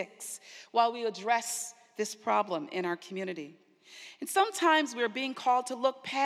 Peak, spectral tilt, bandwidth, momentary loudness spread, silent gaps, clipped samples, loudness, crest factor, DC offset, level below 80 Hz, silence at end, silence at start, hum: -12 dBFS; -2.5 dB/octave; 15.5 kHz; 15 LU; none; under 0.1%; -31 LUFS; 20 dB; under 0.1%; under -90 dBFS; 0 s; 0 s; none